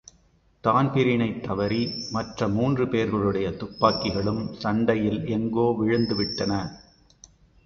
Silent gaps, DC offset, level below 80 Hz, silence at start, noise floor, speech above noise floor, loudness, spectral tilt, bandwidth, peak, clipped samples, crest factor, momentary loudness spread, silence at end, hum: none; under 0.1%; -50 dBFS; 0.65 s; -61 dBFS; 37 dB; -25 LUFS; -7 dB/octave; 7 kHz; -4 dBFS; under 0.1%; 22 dB; 6 LU; 0.85 s; none